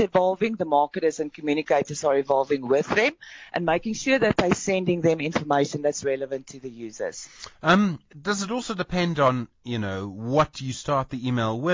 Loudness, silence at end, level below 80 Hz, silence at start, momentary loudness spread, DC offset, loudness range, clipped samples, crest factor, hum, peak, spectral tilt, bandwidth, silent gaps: -24 LUFS; 0 s; -54 dBFS; 0 s; 11 LU; under 0.1%; 3 LU; under 0.1%; 18 dB; none; -6 dBFS; -5 dB/octave; 7.6 kHz; none